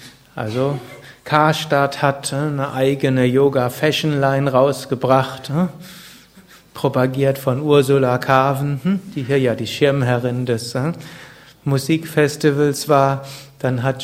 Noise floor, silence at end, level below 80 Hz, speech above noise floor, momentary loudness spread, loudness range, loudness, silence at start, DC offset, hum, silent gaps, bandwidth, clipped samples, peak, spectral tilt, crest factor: -46 dBFS; 0 s; -54 dBFS; 29 dB; 13 LU; 3 LU; -18 LUFS; 0 s; under 0.1%; none; none; 16 kHz; under 0.1%; 0 dBFS; -6 dB/octave; 18 dB